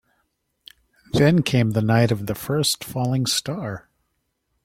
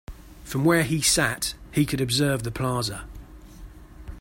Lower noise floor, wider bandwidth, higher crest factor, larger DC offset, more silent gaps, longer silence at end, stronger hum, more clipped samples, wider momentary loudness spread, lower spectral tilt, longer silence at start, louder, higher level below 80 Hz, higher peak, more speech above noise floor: first, -73 dBFS vs -44 dBFS; about the same, 16.5 kHz vs 16.5 kHz; about the same, 18 dB vs 18 dB; neither; neither; first, 0.85 s vs 0 s; neither; neither; second, 12 LU vs 18 LU; about the same, -5 dB/octave vs -4 dB/octave; first, 1.15 s vs 0.1 s; about the same, -21 LUFS vs -23 LUFS; second, -50 dBFS vs -44 dBFS; about the same, -4 dBFS vs -6 dBFS; first, 53 dB vs 20 dB